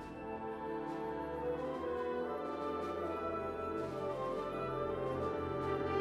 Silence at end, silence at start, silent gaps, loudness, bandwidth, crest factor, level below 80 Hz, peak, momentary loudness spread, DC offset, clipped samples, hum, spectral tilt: 0 s; 0 s; none; -39 LUFS; 13 kHz; 14 dB; -60 dBFS; -24 dBFS; 3 LU; under 0.1%; under 0.1%; none; -7.5 dB/octave